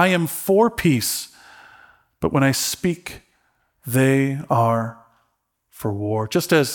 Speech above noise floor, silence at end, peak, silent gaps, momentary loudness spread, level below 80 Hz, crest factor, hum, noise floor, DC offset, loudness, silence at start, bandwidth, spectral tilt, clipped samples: 51 dB; 0 s; -4 dBFS; none; 13 LU; -54 dBFS; 18 dB; none; -71 dBFS; under 0.1%; -20 LUFS; 0 s; 19 kHz; -5 dB/octave; under 0.1%